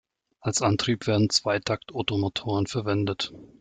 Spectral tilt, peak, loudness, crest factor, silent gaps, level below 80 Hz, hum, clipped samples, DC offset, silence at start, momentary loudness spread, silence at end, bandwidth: -4.5 dB/octave; -8 dBFS; -26 LUFS; 18 dB; none; -58 dBFS; none; under 0.1%; under 0.1%; 0.45 s; 7 LU; 0.15 s; 9.6 kHz